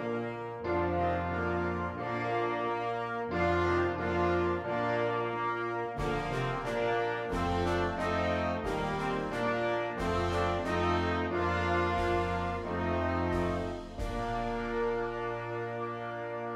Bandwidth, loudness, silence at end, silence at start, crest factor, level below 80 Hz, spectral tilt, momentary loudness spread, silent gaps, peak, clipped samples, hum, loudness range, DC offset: 12.5 kHz; -32 LUFS; 0 s; 0 s; 14 dB; -46 dBFS; -6.5 dB/octave; 6 LU; none; -18 dBFS; under 0.1%; none; 2 LU; under 0.1%